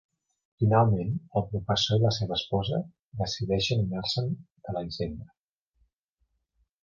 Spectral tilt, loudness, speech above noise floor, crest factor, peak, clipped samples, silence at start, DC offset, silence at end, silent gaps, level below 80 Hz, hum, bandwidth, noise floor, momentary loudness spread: -6 dB/octave; -28 LUFS; 49 dB; 22 dB; -8 dBFS; under 0.1%; 0.6 s; under 0.1%; 1.6 s; 2.99-3.12 s, 4.52-4.56 s; -50 dBFS; none; 7.2 kHz; -76 dBFS; 12 LU